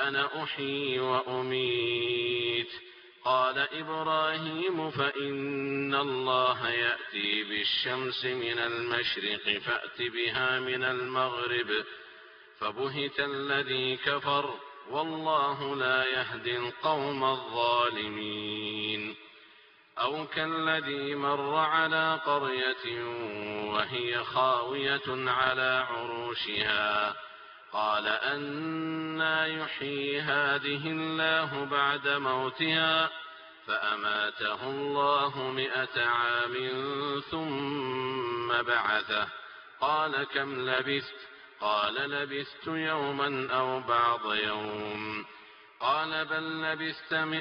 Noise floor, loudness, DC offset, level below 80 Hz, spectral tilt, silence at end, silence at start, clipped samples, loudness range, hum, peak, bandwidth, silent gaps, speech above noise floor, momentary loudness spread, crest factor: -58 dBFS; -30 LUFS; under 0.1%; -70 dBFS; -1 dB/octave; 0 s; 0 s; under 0.1%; 3 LU; none; -8 dBFS; 6.2 kHz; none; 28 dB; 8 LU; 22 dB